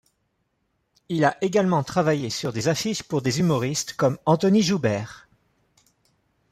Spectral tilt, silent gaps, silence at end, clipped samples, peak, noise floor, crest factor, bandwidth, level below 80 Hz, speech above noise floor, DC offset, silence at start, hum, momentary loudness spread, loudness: -5.5 dB/octave; none; 1.3 s; under 0.1%; -6 dBFS; -73 dBFS; 18 dB; 15.5 kHz; -60 dBFS; 51 dB; under 0.1%; 1.1 s; none; 7 LU; -23 LUFS